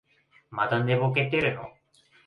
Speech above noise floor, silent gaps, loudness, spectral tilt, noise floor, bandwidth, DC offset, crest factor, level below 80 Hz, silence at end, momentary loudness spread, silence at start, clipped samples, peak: 36 dB; none; -25 LUFS; -8 dB/octave; -62 dBFS; 5.2 kHz; under 0.1%; 18 dB; -62 dBFS; 0.55 s; 15 LU; 0.5 s; under 0.1%; -10 dBFS